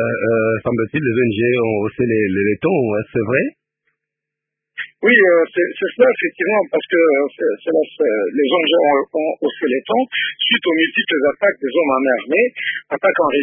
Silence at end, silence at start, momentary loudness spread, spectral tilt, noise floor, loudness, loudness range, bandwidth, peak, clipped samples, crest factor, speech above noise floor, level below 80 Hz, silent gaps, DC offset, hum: 0 s; 0 s; 6 LU; -10.5 dB/octave; -82 dBFS; -16 LUFS; 3 LU; 3.6 kHz; -2 dBFS; under 0.1%; 16 dB; 66 dB; -56 dBFS; none; under 0.1%; none